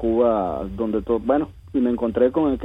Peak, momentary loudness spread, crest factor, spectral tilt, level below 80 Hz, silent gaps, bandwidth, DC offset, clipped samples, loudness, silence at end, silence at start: -6 dBFS; 7 LU; 14 dB; -9.5 dB/octave; -42 dBFS; none; 5 kHz; under 0.1%; under 0.1%; -22 LUFS; 0 s; 0 s